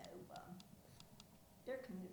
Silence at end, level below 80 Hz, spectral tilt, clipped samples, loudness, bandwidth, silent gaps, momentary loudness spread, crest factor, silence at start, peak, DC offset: 0 s; -76 dBFS; -5.5 dB/octave; under 0.1%; -55 LUFS; over 20 kHz; none; 13 LU; 18 dB; 0 s; -36 dBFS; under 0.1%